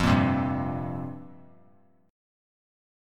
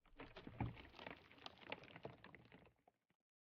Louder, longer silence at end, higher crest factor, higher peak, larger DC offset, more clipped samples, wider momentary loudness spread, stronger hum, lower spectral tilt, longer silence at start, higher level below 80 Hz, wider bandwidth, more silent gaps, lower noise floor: first, -28 LUFS vs -56 LUFS; first, 0.95 s vs 0.5 s; second, 20 dB vs 26 dB; first, -10 dBFS vs -30 dBFS; neither; neither; first, 21 LU vs 14 LU; neither; first, -7 dB/octave vs -4.5 dB/octave; about the same, 0 s vs 0.05 s; first, -46 dBFS vs -70 dBFS; first, 13 kHz vs 6.4 kHz; neither; second, -61 dBFS vs -77 dBFS